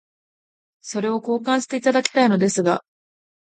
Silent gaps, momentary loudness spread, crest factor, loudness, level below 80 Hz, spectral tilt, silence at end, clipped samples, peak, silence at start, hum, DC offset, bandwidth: none; 9 LU; 22 dB; -20 LUFS; -70 dBFS; -4.5 dB/octave; 0.8 s; under 0.1%; 0 dBFS; 0.85 s; none; under 0.1%; 9.4 kHz